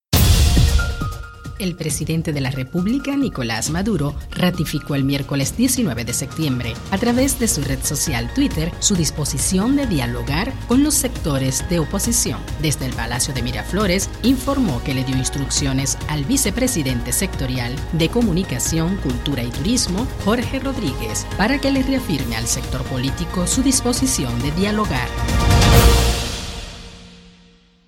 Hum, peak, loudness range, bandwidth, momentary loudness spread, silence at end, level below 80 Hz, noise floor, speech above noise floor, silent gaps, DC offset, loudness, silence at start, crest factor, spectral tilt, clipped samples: none; 0 dBFS; 3 LU; 16.5 kHz; 7 LU; 0.55 s; -26 dBFS; -51 dBFS; 32 dB; none; under 0.1%; -19 LUFS; 0.1 s; 18 dB; -4.5 dB/octave; under 0.1%